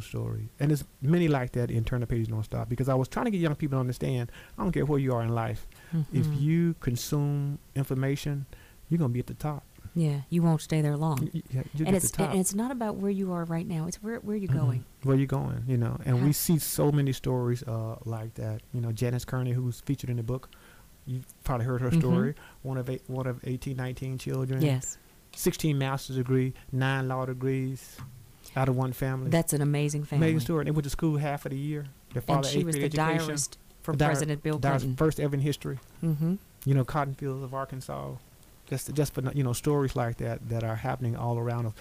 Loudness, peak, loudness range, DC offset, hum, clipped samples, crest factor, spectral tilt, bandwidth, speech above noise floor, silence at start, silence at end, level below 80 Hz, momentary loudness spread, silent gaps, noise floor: -29 LUFS; -14 dBFS; 4 LU; under 0.1%; none; under 0.1%; 14 dB; -6.5 dB/octave; 15.5 kHz; 23 dB; 0 s; 0 s; -50 dBFS; 10 LU; none; -51 dBFS